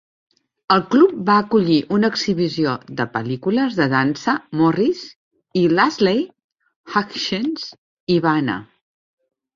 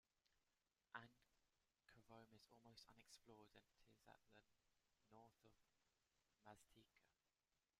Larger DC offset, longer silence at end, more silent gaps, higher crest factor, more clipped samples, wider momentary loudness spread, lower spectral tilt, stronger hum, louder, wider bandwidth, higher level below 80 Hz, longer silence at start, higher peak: neither; first, 0.9 s vs 0.15 s; first, 5.16-5.31 s, 6.44-6.49 s, 6.76-6.84 s, 7.78-8.07 s vs none; second, 18 dB vs 32 dB; neither; first, 10 LU vs 7 LU; first, -6 dB/octave vs -3.5 dB/octave; neither; first, -19 LUFS vs -67 LUFS; second, 7.4 kHz vs 13.5 kHz; first, -58 dBFS vs under -90 dBFS; first, 0.7 s vs 0.15 s; first, -2 dBFS vs -40 dBFS